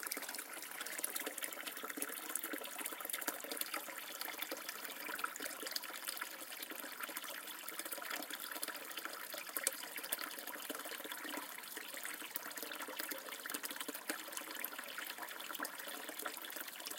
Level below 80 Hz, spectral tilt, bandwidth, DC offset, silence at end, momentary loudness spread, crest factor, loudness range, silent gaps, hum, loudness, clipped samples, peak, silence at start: under -90 dBFS; 0.5 dB/octave; 17 kHz; under 0.1%; 0 s; 5 LU; 32 dB; 2 LU; none; none; -43 LUFS; under 0.1%; -14 dBFS; 0 s